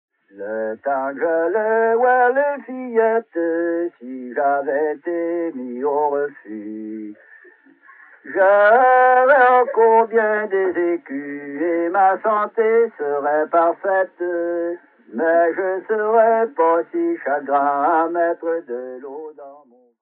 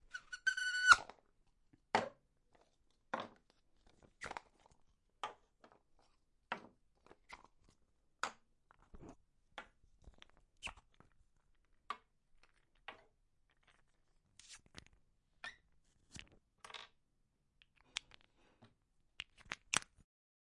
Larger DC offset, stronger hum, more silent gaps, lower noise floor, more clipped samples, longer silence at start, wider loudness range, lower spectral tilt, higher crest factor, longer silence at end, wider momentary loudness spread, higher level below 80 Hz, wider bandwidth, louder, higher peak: neither; neither; neither; second, -49 dBFS vs -80 dBFS; neither; first, 0.35 s vs 0.15 s; second, 8 LU vs 21 LU; first, -9 dB/octave vs -0.5 dB/octave; second, 16 dB vs 36 dB; second, 0.45 s vs 0.65 s; second, 17 LU vs 23 LU; second, -82 dBFS vs -72 dBFS; second, 4 kHz vs 11.5 kHz; first, -18 LUFS vs -39 LUFS; first, -2 dBFS vs -10 dBFS